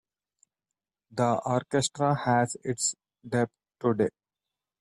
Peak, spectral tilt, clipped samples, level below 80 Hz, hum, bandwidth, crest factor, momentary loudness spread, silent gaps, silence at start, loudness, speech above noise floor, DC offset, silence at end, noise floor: -12 dBFS; -4.5 dB/octave; under 0.1%; -66 dBFS; none; 13.5 kHz; 18 dB; 6 LU; none; 1.1 s; -28 LUFS; 63 dB; under 0.1%; 0.7 s; -90 dBFS